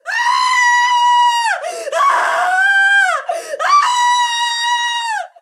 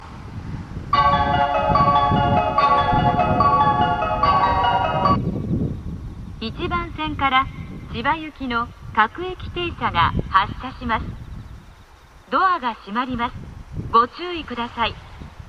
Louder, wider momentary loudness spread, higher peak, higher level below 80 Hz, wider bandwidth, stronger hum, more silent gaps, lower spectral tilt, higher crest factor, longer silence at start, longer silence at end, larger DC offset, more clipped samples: first, -13 LUFS vs -20 LUFS; second, 8 LU vs 16 LU; about the same, -2 dBFS vs -2 dBFS; second, -84 dBFS vs -36 dBFS; first, 14 kHz vs 9 kHz; neither; neither; second, 4 dB/octave vs -7 dB/octave; second, 12 dB vs 20 dB; about the same, 0.05 s vs 0 s; first, 0.15 s vs 0 s; neither; neither